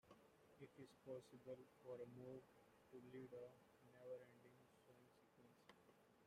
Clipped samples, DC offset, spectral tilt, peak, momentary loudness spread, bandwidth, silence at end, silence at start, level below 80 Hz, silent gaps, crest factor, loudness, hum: under 0.1%; under 0.1%; -6.5 dB/octave; -44 dBFS; 8 LU; 15 kHz; 0 s; 0.05 s; under -90 dBFS; none; 18 dB; -61 LUFS; none